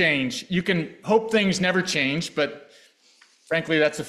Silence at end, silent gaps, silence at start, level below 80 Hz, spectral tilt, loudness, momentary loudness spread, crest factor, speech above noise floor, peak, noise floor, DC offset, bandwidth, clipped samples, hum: 0 s; none; 0 s; -60 dBFS; -4.5 dB/octave; -23 LUFS; 6 LU; 16 dB; 35 dB; -8 dBFS; -58 dBFS; under 0.1%; 13.5 kHz; under 0.1%; none